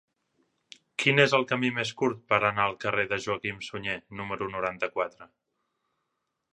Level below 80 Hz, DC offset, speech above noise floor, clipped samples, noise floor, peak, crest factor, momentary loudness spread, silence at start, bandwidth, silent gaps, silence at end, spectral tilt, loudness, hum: -64 dBFS; under 0.1%; 53 dB; under 0.1%; -81 dBFS; -4 dBFS; 24 dB; 12 LU; 1 s; 11.5 kHz; none; 1.3 s; -4.5 dB/octave; -27 LUFS; none